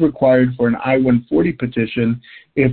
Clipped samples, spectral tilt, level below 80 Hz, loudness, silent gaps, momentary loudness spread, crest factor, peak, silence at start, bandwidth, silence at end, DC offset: under 0.1%; -13 dB/octave; -46 dBFS; -17 LUFS; none; 7 LU; 14 dB; -2 dBFS; 0 s; 4.4 kHz; 0 s; under 0.1%